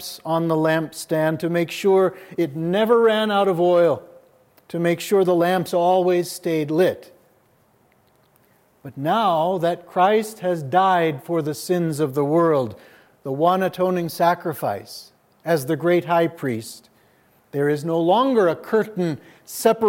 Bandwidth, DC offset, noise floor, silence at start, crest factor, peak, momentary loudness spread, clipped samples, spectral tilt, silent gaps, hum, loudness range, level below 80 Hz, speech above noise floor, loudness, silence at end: 17 kHz; under 0.1%; -59 dBFS; 0 s; 18 dB; -4 dBFS; 10 LU; under 0.1%; -6 dB/octave; none; none; 5 LU; -72 dBFS; 39 dB; -20 LUFS; 0 s